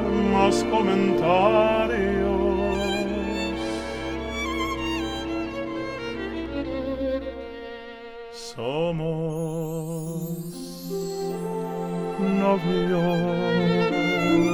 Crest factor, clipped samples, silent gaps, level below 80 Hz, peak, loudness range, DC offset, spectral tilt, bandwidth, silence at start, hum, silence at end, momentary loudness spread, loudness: 18 dB; under 0.1%; none; -42 dBFS; -6 dBFS; 8 LU; under 0.1%; -6 dB/octave; 17.5 kHz; 0 s; none; 0 s; 12 LU; -25 LUFS